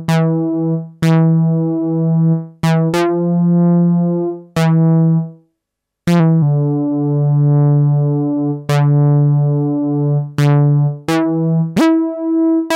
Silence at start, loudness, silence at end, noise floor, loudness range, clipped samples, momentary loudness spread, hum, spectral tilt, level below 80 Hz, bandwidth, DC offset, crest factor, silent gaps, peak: 0 s; -14 LUFS; 0 s; -78 dBFS; 1 LU; under 0.1%; 5 LU; none; -8.5 dB/octave; -54 dBFS; 11 kHz; under 0.1%; 8 dB; none; -6 dBFS